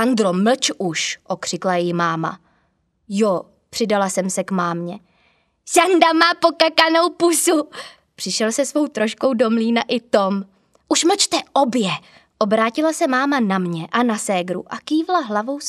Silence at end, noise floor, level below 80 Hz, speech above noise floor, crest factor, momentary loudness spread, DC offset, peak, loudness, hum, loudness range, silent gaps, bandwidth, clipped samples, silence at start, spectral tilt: 0 s; -65 dBFS; -68 dBFS; 47 dB; 20 dB; 11 LU; under 0.1%; 0 dBFS; -18 LUFS; none; 6 LU; none; 15 kHz; under 0.1%; 0 s; -3.5 dB/octave